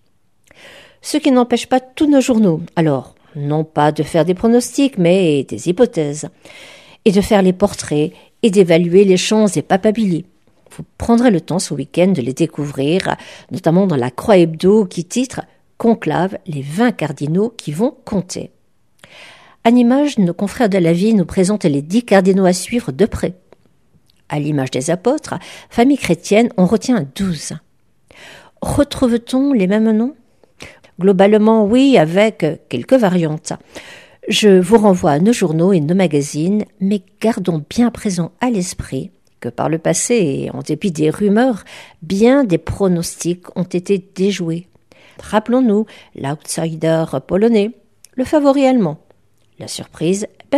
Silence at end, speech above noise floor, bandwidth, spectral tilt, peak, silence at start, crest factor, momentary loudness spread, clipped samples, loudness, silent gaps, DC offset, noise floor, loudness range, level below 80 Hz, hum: 0 s; 45 dB; 14.5 kHz; -6 dB/octave; 0 dBFS; 0.65 s; 16 dB; 13 LU; under 0.1%; -15 LUFS; none; 0.2%; -60 dBFS; 5 LU; -44 dBFS; none